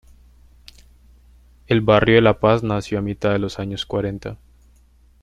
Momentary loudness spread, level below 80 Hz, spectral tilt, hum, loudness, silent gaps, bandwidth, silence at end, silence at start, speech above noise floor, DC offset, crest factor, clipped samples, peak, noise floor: 13 LU; -44 dBFS; -7 dB/octave; none; -19 LUFS; none; 10.5 kHz; 0.85 s; 1.7 s; 35 dB; under 0.1%; 20 dB; under 0.1%; -2 dBFS; -53 dBFS